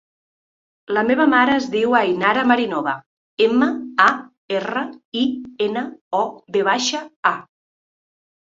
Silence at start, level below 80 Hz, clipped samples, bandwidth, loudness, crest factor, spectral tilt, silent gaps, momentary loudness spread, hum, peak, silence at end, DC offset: 0.9 s; -64 dBFS; under 0.1%; 7.6 kHz; -19 LUFS; 18 dB; -3.5 dB/octave; 3.06-3.37 s, 4.38-4.48 s, 5.05-5.12 s, 6.01-6.11 s, 7.16-7.23 s; 10 LU; none; -2 dBFS; 1 s; under 0.1%